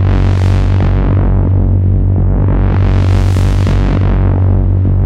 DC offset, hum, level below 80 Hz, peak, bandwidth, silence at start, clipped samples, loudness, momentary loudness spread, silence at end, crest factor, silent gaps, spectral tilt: under 0.1%; 50 Hz at -20 dBFS; -14 dBFS; -2 dBFS; 6.8 kHz; 0 s; under 0.1%; -12 LUFS; 1 LU; 0 s; 6 dB; none; -8.5 dB/octave